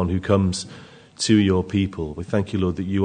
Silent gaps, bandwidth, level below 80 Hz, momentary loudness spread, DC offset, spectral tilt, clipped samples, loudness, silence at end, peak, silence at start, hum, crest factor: none; 9.6 kHz; -50 dBFS; 11 LU; under 0.1%; -6 dB/octave; under 0.1%; -22 LUFS; 0 s; -4 dBFS; 0 s; none; 18 dB